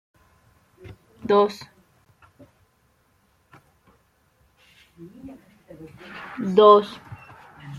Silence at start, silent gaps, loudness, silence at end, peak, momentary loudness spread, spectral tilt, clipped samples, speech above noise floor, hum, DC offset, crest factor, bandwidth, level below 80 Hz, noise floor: 0.85 s; none; -18 LUFS; 0 s; -2 dBFS; 30 LU; -6.5 dB/octave; under 0.1%; 45 dB; none; under 0.1%; 24 dB; 7.2 kHz; -64 dBFS; -64 dBFS